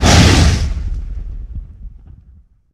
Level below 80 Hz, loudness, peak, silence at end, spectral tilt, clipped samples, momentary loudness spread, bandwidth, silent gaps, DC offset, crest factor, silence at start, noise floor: -20 dBFS; -13 LUFS; 0 dBFS; 0.85 s; -4.5 dB/octave; under 0.1%; 23 LU; 14.5 kHz; none; under 0.1%; 14 dB; 0 s; -46 dBFS